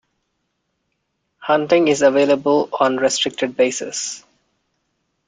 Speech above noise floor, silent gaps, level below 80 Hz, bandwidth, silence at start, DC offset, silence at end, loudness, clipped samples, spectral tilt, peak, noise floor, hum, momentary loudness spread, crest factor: 55 dB; none; -64 dBFS; 9.4 kHz; 1.4 s; under 0.1%; 1.1 s; -17 LUFS; under 0.1%; -3 dB/octave; -2 dBFS; -72 dBFS; none; 11 LU; 18 dB